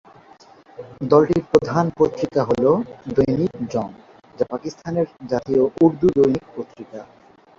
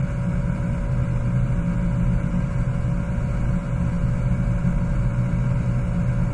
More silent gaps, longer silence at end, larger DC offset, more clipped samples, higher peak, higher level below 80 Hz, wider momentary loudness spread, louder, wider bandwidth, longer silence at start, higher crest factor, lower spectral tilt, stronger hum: neither; first, 0.55 s vs 0 s; neither; neither; first, -2 dBFS vs -8 dBFS; second, -52 dBFS vs -26 dBFS; first, 18 LU vs 2 LU; first, -20 LUFS vs -23 LUFS; second, 7.6 kHz vs 9.4 kHz; first, 0.8 s vs 0 s; first, 18 dB vs 12 dB; about the same, -8 dB/octave vs -9 dB/octave; neither